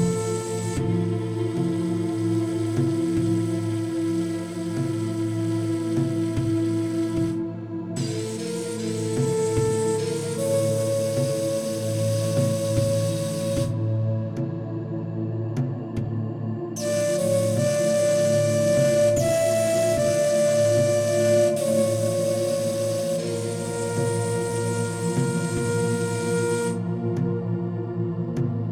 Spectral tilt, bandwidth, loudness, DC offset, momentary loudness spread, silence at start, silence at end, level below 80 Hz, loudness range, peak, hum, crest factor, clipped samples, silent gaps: -6 dB/octave; 16.5 kHz; -24 LUFS; under 0.1%; 8 LU; 0 s; 0 s; -52 dBFS; 6 LU; -8 dBFS; none; 14 dB; under 0.1%; none